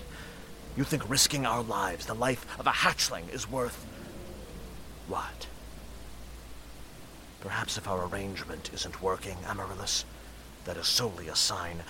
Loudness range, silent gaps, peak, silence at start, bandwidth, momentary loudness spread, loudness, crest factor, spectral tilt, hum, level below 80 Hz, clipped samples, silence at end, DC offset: 13 LU; none; -8 dBFS; 0 s; 17 kHz; 21 LU; -30 LUFS; 24 dB; -2.5 dB/octave; none; -50 dBFS; under 0.1%; 0 s; under 0.1%